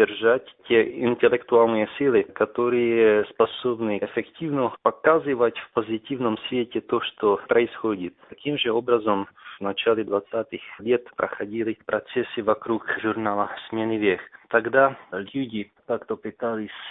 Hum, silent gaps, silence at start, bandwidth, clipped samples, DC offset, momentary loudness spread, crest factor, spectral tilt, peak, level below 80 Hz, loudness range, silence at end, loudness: none; none; 0 s; 4 kHz; under 0.1%; under 0.1%; 10 LU; 20 dB; -10 dB/octave; -4 dBFS; -64 dBFS; 5 LU; 0 s; -24 LUFS